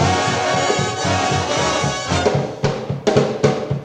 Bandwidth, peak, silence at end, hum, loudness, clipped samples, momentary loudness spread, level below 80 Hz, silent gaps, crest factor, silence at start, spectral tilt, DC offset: 10.5 kHz; -2 dBFS; 0 s; none; -18 LUFS; under 0.1%; 4 LU; -46 dBFS; none; 16 dB; 0 s; -4.5 dB/octave; under 0.1%